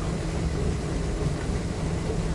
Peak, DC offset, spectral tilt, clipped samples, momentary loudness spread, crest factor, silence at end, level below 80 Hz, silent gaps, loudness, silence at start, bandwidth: -14 dBFS; under 0.1%; -6.5 dB/octave; under 0.1%; 2 LU; 12 dB; 0 s; -32 dBFS; none; -29 LUFS; 0 s; 11.5 kHz